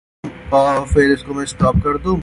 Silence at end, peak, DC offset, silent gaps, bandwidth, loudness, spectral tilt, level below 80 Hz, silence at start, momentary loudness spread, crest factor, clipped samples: 0 s; -2 dBFS; under 0.1%; none; 11.5 kHz; -16 LUFS; -6.5 dB/octave; -28 dBFS; 0.25 s; 12 LU; 16 dB; under 0.1%